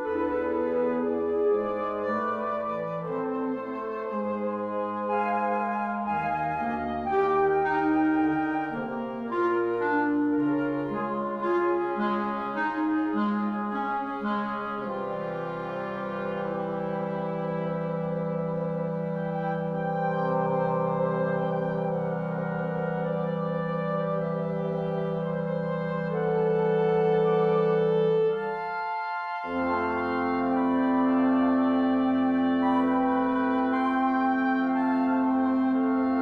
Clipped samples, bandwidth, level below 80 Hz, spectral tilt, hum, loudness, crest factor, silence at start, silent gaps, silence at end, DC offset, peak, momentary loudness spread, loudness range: under 0.1%; 5.2 kHz; -60 dBFS; -9.5 dB/octave; none; -27 LUFS; 12 dB; 0 s; none; 0 s; under 0.1%; -14 dBFS; 7 LU; 6 LU